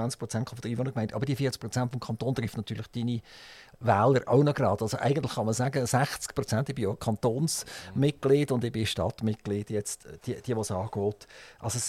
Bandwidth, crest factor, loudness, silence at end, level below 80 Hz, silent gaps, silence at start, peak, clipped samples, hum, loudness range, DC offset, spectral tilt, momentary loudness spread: 16 kHz; 18 dB; -29 LUFS; 0 s; -58 dBFS; none; 0 s; -10 dBFS; under 0.1%; none; 5 LU; under 0.1%; -5.5 dB/octave; 12 LU